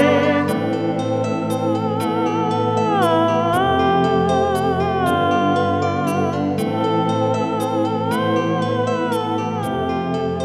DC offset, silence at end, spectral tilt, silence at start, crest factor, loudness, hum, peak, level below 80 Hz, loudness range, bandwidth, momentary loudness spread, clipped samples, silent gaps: under 0.1%; 0 s; -6.5 dB/octave; 0 s; 14 dB; -19 LUFS; none; -4 dBFS; -50 dBFS; 3 LU; 14.5 kHz; 5 LU; under 0.1%; none